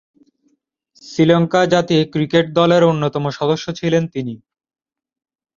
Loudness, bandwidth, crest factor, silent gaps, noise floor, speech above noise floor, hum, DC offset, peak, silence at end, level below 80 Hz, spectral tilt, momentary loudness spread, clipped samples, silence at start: -16 LUFS; 7.4 kHz; 16 dB; none; -64 dBFS; 49 dB; none; under 0.1%; -2 dBFS; 1.2 s; -56 dBFS; -6.5 dB/octave; 12 LU; under 0.1%; 1.05 s